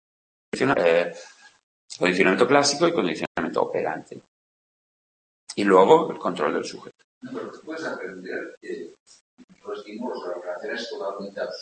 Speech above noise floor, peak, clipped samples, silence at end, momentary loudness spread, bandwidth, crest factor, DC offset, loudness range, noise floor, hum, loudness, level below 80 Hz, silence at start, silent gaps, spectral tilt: over 67 dB; -2 dBFS; under 0.1%; 0 s; 19 LU; 8.8 kHz; 24 dB; under 0.1%; 12 LU; under -90 dBFS; none; -23 LUFS; -68 dBFS; 0.55 s; 1.63-1.88 s, 3.27-3.35 s, 4.28-5.47 s, 7.04-7.21 s, 8.57-8.61 s, 9.00-9.06 s, 9.21-9.37 s, 9.44-9.48 s; -4 dB/octave